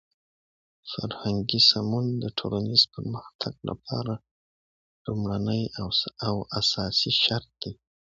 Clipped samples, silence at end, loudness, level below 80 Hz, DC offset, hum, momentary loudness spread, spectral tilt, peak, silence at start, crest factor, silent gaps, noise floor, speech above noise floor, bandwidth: under 0.1%; 0.4 s; -25 LUFS; -54 dBFS; under 0.1%; none; 17 LU; -5 dB/octave; -6 dBFS; 0.85 s; 24 dB; 3.35-3.39 s, 4.31-5.05 s; under -90 dBFS; over 63 dB; 7.8 kHz